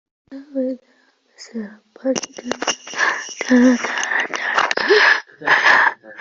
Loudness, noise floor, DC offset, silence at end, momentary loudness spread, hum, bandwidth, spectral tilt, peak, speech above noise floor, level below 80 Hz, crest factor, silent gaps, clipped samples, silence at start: -17 LUFS; -58 dBFS; under 0.1%; 0 s; 19 LU; none; 7.6 kHz; -2 dB/octave; 0 dBFS; 40 dB; -66 dBFS; 18 dB; none; under 0.1%; 0.3 s